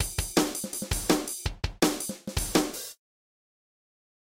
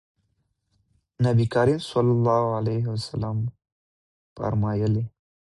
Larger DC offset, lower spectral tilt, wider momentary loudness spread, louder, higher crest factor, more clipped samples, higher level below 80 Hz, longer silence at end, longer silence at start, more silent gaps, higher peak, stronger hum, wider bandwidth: neither; second, -3.5 dB/octave vs -8 dB/octave; about the same, 7 LU vs 9 LU; second, -29 LUFS vs -24 LUFS; first, 22 dB vs 16 dB; neither; first, -42 dBFS vs -52 dBFS; first, 1.4 s vs 0.5 s; second, 0 s vs 1.2 s; second, none vs 3.72-4.36 s; about the same, -10 dBFS vs -8 dBFS; neither; first, 17 kHz vs 11.5 kHz